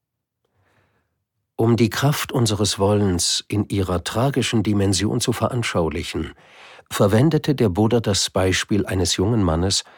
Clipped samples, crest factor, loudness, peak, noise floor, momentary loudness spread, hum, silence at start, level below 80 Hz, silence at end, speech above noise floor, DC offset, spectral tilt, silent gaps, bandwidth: under 0.1%; 16 dB; -20 LUFS; -4 dBFS; -76 dBFS; 5 LU; none; 1.6 s; -42 dBFS; 0.15 s; 56 dB; under 0.1%; -5 dB/octave; none; 19 kHz